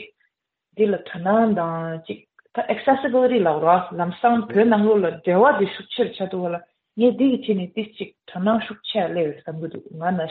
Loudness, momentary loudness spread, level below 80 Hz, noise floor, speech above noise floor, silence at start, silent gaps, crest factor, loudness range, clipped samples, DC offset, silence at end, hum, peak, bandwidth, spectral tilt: -21 LUFS; 15 LU; -66 dBFS; -72 dBFS; 52 dB; 0 s; none; 18 dB; 5 LU; under 0.1%; under 0.1%; 0 s; none; -2 dBFS; 4.5 kHz; -5 dB/octave